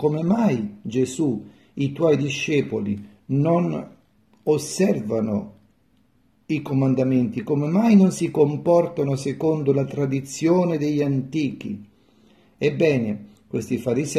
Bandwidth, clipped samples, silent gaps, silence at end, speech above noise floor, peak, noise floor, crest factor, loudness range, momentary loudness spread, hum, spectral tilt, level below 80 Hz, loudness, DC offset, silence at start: 13.5 kHz; under 0.1%; none; 0 s; 41 dB; -6 dBFS; -62 dBFS; 16 dB; 5 LU; 11 LU; none; -7 dB/octave; -62 dBFS; -22 LUFS; under 0.1%; 0 s